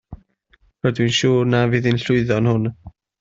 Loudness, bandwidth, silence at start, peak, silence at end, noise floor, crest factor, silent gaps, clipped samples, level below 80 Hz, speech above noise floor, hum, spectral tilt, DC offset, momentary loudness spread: -18 LUFS; 7.8 kHz; 0.1 s; -4 dBFS; 0.3 s; -59 dBFS; 16 dB; none; under 0.1%; -48 dBFS; 41 dB; none; -6 dB/octave; under 0.1%; 6 LU